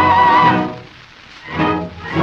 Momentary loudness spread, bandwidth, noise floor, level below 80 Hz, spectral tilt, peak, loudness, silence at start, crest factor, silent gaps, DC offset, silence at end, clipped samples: 20 LU; 7.2 kHz; -40 dBFS; -46 dBFS; -6.5 dB/octave; -2 dBFS; -14 LUFS; 0 s; 14 dB; none; under 0.1%; 0 s; under 0.1%